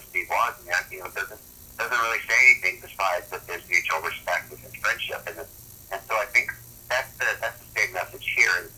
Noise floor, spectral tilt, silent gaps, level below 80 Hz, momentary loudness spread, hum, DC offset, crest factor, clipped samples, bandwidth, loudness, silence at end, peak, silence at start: -45 dBFS; -1 dB/octave; none; -58 dBFS; 16 LU; none; under 0.1%; 22 dB; under 0.1%; over 20 kHz; -24 LUFS; 0 s; -4 dBFS; 0 s